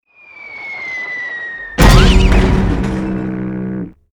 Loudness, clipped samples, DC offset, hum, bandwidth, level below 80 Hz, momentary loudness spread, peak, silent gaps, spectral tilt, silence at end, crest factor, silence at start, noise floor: -15 LUFS; under 0.1%; under 0.1%; none; over 20 kHz; -16 dBFS; 17 LU; 0 dBFS; none; -5.5 dB/octave; 0.2 s; 14 dB; 0.35 s; -37 dBFS